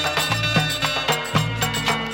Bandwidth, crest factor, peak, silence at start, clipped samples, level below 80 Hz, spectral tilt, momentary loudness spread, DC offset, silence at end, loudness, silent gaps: 19 kHz; 18 dB; -4 dBFS; 0 s; under 0.1%; -42 dBFS; -3.5 dB/octave; 3 LU; under 0.1%; 0 s; -20 LUFS; none